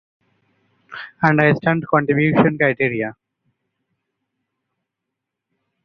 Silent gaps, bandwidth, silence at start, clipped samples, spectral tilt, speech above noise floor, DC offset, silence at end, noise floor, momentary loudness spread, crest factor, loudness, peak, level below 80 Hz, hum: none; 6.2 kHz; 0.9 s; under 0.1%; -9.5 dB/octave; 64 dB; under 0.1%; 2.75 s; -81 dBFS; 17 LU; 20 dB; -17 LUFS; -2 dBFS; -58 dBFS; none